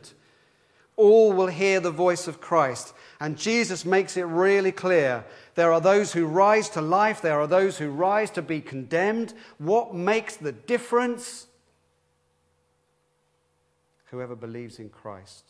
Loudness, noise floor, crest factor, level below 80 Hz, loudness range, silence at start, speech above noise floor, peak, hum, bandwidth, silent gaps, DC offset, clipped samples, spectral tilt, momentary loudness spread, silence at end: -23 LUFS; -70 dBFS; 18 dB; -76 dBFS; 11 LU; 0.05 s; 47 dB; -6 dBFS; none; 11 kHz; none; under 0.1%; under 0.1%; -5 dB/octave; 18 LU; 0.3 s